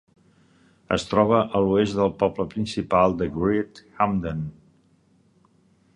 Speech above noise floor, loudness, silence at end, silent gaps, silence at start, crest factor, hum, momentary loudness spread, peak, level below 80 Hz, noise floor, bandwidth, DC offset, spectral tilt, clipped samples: 38 dB; -23 LUFS; 1.45 s; none; 0.9 s; 20 dB; none; 9 LU; -4 dBFS; -48 dBFS; -61 dBFS; 10.5 kHz; under 0.1%; -7 dB/octave; under 0.1%